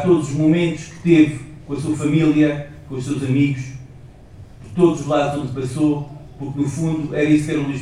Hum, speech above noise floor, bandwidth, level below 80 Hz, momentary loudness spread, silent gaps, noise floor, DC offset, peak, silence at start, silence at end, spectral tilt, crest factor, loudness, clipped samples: none; 23 dB; 11.5 kHz; -46 dBFS; 14 LU; none; -41 dBFS; under 0.1%; -2 dBFS; 0 s; 0 s; -7 dB/octave; 16 dB; -19 LUFS; under 0.1%